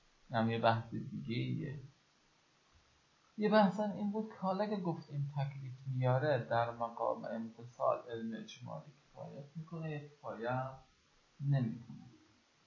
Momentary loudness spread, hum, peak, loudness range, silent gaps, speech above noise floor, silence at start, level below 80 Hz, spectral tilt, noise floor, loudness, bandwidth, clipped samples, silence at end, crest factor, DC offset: 17 LU; none; -16 dBFS; 6 LU; none; 35 dB; 0.3 s; -74 dBFS; -6 dB/octave; -72 dBFS; -37 LUFS; 7.2 kHz; under 0.1%; 0.5 s; 22 dB; under 0.1%